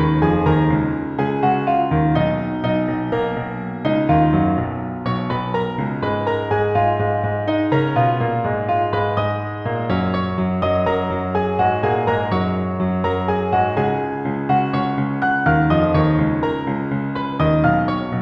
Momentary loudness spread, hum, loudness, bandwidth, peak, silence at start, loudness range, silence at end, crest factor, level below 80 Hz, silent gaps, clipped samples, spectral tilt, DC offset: 7 LU; none; -19 LUFS; 5.4 kHz; -4 dBFS; 0 s; 2 LU; 0 s; 16 dB; -40 dBFS; none; under 0.1%; -9.5 dB/octave; under 0.1%